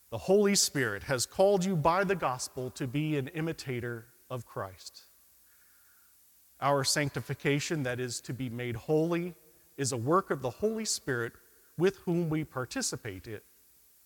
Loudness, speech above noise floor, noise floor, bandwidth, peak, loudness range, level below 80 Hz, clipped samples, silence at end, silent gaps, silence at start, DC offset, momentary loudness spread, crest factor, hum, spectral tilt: -31 LUFS; 31 dB; -62 dBFS; 18 kHz; -14 dBFS; 8 LU; -64 dBFS; under 0.1%; 0.65 s; none; 0.1 s; under 0.1%; 15 LU; 18 dB; none; -4.5 dB/octave